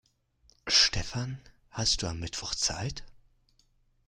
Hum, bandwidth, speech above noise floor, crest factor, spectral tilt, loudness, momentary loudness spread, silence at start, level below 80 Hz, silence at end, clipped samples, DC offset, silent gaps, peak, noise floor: none; 15.5 kHz; 35 dB; 22 dB; -2 dB/octave; -28 LUFS; 21 LU; 0.65 s; -46 dBFS; 0.9 s; under 0.1%; under 0.1%; none; -10 dBFS; -68 dBFS